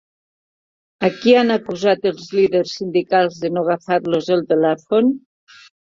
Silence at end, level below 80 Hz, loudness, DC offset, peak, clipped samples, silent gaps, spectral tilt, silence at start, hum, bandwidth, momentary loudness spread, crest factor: 0.75 s; -62 dBFS; -18 LUFS; under 0.1%; -2 dBFS; under 0.1%; none; -6 dB/octave; 1 s; none; 7.6 kHz; 7 LU; 16 dB